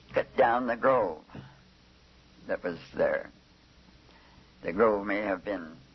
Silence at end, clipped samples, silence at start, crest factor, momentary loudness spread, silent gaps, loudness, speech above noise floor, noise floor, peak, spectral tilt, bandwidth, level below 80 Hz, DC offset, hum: 0.2 s; under 0.1%; 0.1 s; 18 dB; 19 LU; none; -29 LUFS; 30 dB; -59 dBFS; -12 dBFS; -7 dB/octave; 6.2 kHz; -60 dBFS; under 0.1%; none